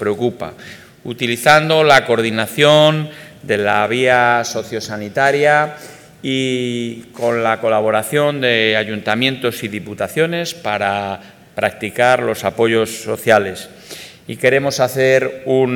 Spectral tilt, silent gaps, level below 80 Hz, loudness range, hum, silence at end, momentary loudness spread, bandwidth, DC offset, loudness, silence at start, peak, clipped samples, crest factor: -4.5 dB/octave; none; -58 dBFS; 5 LU; none; 0 s; 18 LU; 19 kHz; under 0.1%; -15 LUFS; 0 s; 0 dBFS; under 0.1%; 16 dB